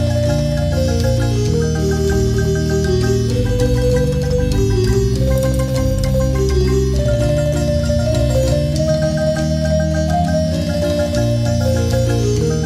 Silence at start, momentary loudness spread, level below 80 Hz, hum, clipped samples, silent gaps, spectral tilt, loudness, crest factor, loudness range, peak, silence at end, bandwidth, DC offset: 0 s; 2 LU; -22 dBFS; none; under 0.1%; none; -6.5 dB/octave; -16 LUFS; 12 dB; 1 LU; -4 dBFS; 0 s; 15 kHz; under 0.1%